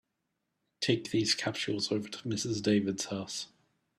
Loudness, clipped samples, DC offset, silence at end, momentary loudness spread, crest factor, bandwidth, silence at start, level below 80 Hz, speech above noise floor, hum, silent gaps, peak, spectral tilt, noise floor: -32 LUFS; under 0.1%; under 0.1%; 0.5 s; 8 LU; 20 dB; 13.5 kHz; 0.8 s; -70 dBFS; 51 dB; none; none; -14 dBFS; -4 dB/octave; -83 dBFS